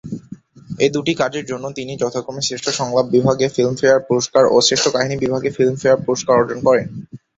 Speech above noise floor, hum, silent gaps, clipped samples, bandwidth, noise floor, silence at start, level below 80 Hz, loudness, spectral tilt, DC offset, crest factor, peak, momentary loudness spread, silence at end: 22 dB; none; none; under 0.1%; 8 kHz; -39 dBFS; 0.05 s; -54 dBFS; -17 LUFS; -4 dB/octave; under 0.1%; 16 dB; 0 dBFS; 12 LU; 0.2 s